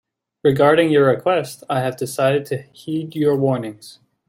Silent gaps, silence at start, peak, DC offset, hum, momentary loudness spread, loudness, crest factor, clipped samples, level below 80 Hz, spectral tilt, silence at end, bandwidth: none; 0.45 s; -2 dBFS; under 0.1%; none; 13 LU; -19 LUFS; 16 dB; under 0.1%; -62 dBFS; -6 dB/octave; 0.4 s; 16.5 kHz